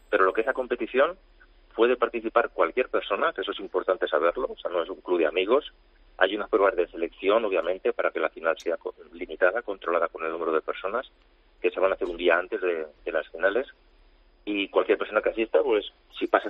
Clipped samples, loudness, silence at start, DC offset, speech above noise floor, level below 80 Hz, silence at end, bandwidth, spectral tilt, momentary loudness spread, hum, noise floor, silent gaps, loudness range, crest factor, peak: under 0.1%; -26 LUFS; 0.1 s; under 0.1%; 32 dB; -58 dBFS; 0 s; 7 kHz; -5 dB/octave; 8 LU; none; -58 dBFS; none; 2 LU; 22 dB; -4 dBFS